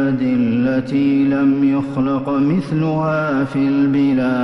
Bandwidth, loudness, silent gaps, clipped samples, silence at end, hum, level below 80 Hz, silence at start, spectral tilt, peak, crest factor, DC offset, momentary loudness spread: 6 kHz; -17 LUFS; none; under 0.1%; 0 s; none; -50 dBFS; 0 s; -9 dB/octave; -8 dBFS; 8 dB; under 0.1%; 4 LU